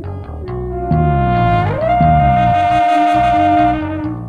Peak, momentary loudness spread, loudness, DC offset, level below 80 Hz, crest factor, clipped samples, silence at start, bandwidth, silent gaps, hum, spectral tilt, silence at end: 0 dBFS; 12 LU; -13 LUFS; under 0.1%; -26 dBFS; 12 dB; under 0.1%; 0 s; 9.2 kHz; none; none; -8.5 dB/octave; 0 s